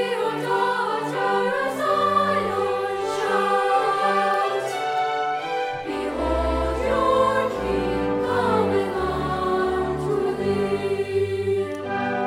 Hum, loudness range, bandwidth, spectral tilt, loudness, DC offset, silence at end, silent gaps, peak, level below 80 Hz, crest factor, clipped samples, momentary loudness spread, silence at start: none; 2 LU; 16 kHz; -5.5 dB/octave; -23 LUFS; under 0.1%; 0 s; none; -8 dBFS; -40 dBFS; 14 dB; under 0.1%; 5 LU; 0 s